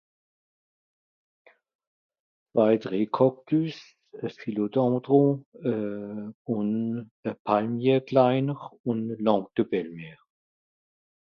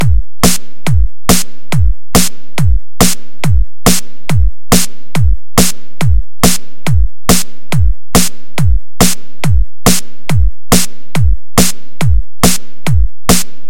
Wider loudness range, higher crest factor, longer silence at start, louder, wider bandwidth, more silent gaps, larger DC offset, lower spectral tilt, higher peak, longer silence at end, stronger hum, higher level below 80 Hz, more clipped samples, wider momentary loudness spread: about the same, 2 LU vs 1 LU; about the same, 20 dB vs 16 dB; first, 2.55 s vs 0 s; second, -26 LUFS vs -13 LUFS; second, 6.6 kHz vs over 20 kHz; first, 5.46-5.52 s, 6.34-6.45 s, 7.11-7.23 s, 7.39-7.45 s, 8.80-8.84 s vs none; second, under 0.1% vs 40%; first, -9 dB/octave vs -4 dB/octave; second, -6 dBFS vs 0 dBFS; first, 1.1 s vs 0.25 s; neither; second, -72 dBFS vs -18 dBFS; second, under 0.1% vs 0.3%; first, 14 LU vs 5 LU